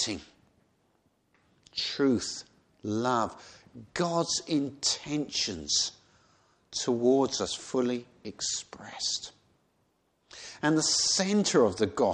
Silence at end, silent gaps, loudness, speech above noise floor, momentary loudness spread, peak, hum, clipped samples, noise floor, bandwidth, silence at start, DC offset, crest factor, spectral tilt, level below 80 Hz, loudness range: 0 s; none; -28 LUFS; 43 dB; 16 LU; -10 dBFS; none; under 0.1%; -72 dBFS; 10 kHz; 0 s; under 0.1%; 20 dB; -3 dB/octave; -64 dBFS; 4 LU